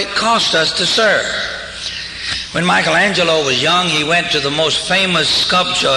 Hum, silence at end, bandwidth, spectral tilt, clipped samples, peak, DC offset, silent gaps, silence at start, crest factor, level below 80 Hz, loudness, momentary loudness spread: none; 0 s; 11.5 kHz; -2.5 dB/octave; under 0.1%; -2 dBFS; under 0.1%; none; 0 s; 14 dB; -44 dBFS; -13 LUFS; 9 LU